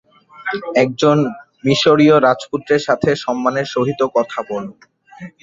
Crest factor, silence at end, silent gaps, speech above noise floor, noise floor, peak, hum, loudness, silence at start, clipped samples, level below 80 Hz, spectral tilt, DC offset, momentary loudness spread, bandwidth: 16 dB; 0.15 s; none; 22 dB; -37 dBFS; -2 dBFS; none; -16 LUFS; 0.4 s; under 0.1%; -56 dBFS; -5.5 dB/octave; under 0.1%; 13 LU; 7.8 kHz